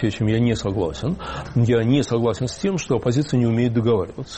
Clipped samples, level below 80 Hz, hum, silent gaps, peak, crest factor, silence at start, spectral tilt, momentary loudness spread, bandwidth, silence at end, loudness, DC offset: under 0.1%; -42 dBFS; none; none; -8 dBFS; 12 dB; 0 s; -7 dB/octave; 6 LU; 8.8 kHz; 0 s; -21 LUFS; under 0.1%